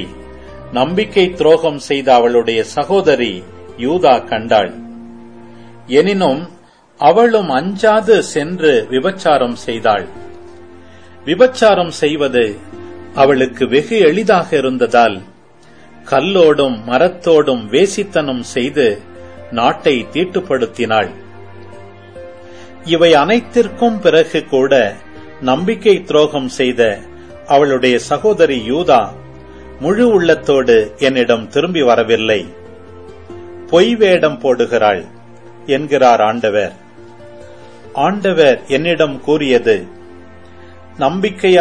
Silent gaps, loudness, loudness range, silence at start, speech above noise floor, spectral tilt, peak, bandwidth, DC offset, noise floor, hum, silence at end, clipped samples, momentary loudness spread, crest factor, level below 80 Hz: none; -13 LUFS; 3 LU; 0 s; 32 dB; -5 dB/octave; 0 dBFS; 10 kHz; 0.9%; -44 dBFS; none; 0 s; under 0.1%; 12 LU; 14 dB; -48 dBFS